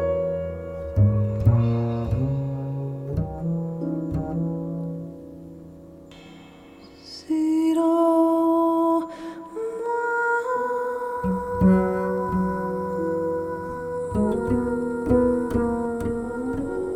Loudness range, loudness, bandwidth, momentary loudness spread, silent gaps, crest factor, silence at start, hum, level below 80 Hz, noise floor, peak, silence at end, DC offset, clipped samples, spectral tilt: 8 LU; -24 LUFS; 14.5 kHz; 15 LU; none; 18 dB; 0 s; none; -42 dBFS; -46 dBFS; -6 dBFS; 0 s; under 0.1%; under 0.1%; -9 dB/octave